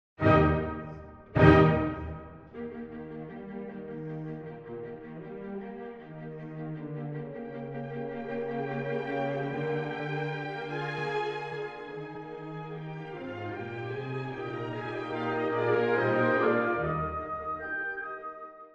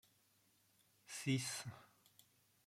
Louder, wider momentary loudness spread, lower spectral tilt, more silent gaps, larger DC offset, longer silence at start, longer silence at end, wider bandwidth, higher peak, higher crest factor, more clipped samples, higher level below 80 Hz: first, -31 LUFS vs -44 LUFS; about the same, 16 LU vs 15 LU; first, -8.5 dB/octave vs -4 dB/octave; neither; neither; second, 0.2 s vs 1.1 s; second, 0 s vs 0.8 s; second, 7.2 kHz vs 16.5 kHz; first, -2 dBFS vs -26 dBFS; first, 28 dB vs 22 dB; neither; first, -48 dBFS vs -84 dBFS